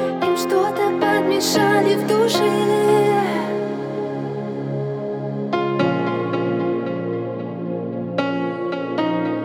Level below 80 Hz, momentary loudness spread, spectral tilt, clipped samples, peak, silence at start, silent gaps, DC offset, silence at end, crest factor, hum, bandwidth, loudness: -70 dBFS; 10 LU; -5.5 dB/octave; under 0.1%; -4 dBFS; 0 s; none; under 0.1%; 0 s; 14 dB; none; 18.5 kHz; -20 LUFS